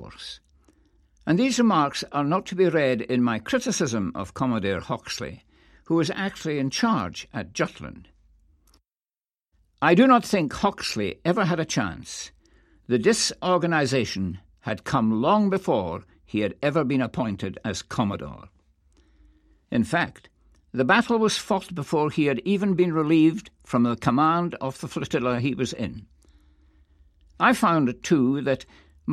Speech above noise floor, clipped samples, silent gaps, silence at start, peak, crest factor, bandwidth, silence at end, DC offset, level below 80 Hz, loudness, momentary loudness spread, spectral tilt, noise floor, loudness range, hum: over 67 dB; under 0.1%; none; 0 s; -4 dBFS; 22 dB; 14 kHz; 0 s; under 0.1%; -56 dBFS; -24 LUFS; 13 LU; -5 dB/octave; under -90 dBFS; 6 LU; none